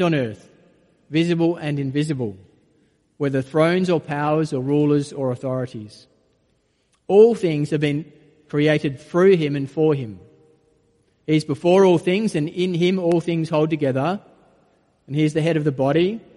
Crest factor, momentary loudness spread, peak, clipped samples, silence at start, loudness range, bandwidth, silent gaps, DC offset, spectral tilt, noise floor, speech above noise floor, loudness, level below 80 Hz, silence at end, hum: 18 dB; 12 LU; -2 dBFS; under 0.1%; 0 s; 4 LU; 11.5 kHz; none; under 0.1%; -7.5 dB/octave; -65 dBFS; 46 dB; -20 LUFS; -62 dBFS; 0.15 s; none